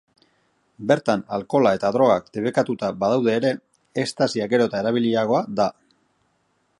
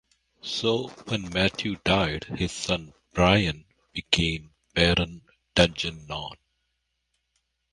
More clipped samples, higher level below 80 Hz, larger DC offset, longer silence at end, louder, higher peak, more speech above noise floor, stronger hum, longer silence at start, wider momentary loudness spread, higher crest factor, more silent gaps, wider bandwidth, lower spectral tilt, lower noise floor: neither; second, -62 dBFS vs -42 dBFS; neither; second, 1.1 s vs 1.4 s; first, -21 LUFS vs -25 LUFS; about the same, -4 dBFS vs -2 dBFS; second, 47 dB vs 52 dB; neither; first, 0.8 s vs 0.45 s; second, 6 LU vs 14 LU; about the same, 20 dB vs 24 dB; neither; about the same, 11.5 kHz vs 11.5 kHz; first, -6 dB/octave vs -4.5 dB/octave; second, -68 dBFS vs -77 dBFS